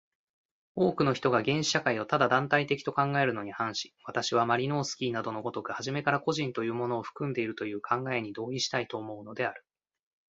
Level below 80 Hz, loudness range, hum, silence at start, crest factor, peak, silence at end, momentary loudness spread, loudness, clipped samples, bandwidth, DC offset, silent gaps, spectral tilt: -68 dBFS; 5 LU; none; 0.75 s; 22 dB; -8 dBFS; 0.7 s; 9 LU; -30 LUFS; under 0.1%; 8 kHz; under 0.1%; none; -4.5 dB/octave